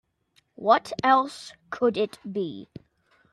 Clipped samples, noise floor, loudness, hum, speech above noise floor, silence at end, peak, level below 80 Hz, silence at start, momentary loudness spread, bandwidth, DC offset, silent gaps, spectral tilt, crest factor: under 0.1%; -67 dBFS; -25 LUFS; none; 42 dB; 0.7 s; -4 dBFS; -68 dBFS; 0.6 s; 16 LU; 13.5 kHz; under 0.1%; none; -5 dB/octave; 22 dB